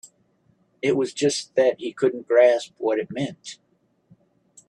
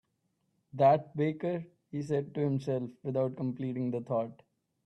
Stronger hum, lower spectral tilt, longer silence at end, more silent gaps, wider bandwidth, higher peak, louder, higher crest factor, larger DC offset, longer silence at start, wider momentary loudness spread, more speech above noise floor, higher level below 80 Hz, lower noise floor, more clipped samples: neither; second, -4.5 dB/octave vs -9 dB/octave; first, 1.15 s vs 0.55 s; neither; first, 11 kHz vs 9 kHz; first, -6 dBFS vs -14 dBFS; first, -22 LUFS vs -32 LUFS; about the same, 18 dB vs 18 dB; neither; about the same, 0.85 s vs 0.75 s; about the same, 13 LU vs 14 LU; second, 42 dB vs 47 dB; about the same, -70 dBFS vs -74 dBFS; second, -64 dBFS vs -78 dBFS; neither